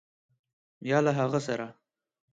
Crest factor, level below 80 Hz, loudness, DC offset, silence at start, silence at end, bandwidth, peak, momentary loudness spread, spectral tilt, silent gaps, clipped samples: 20 dB; -74 dBFS; -28 LUFS; under 0.1%; 0.8 s; 0.6 s; 9.2 kHz; -12 dBFS; 15 LU; -6.5 dB/octave; none; under 0.1%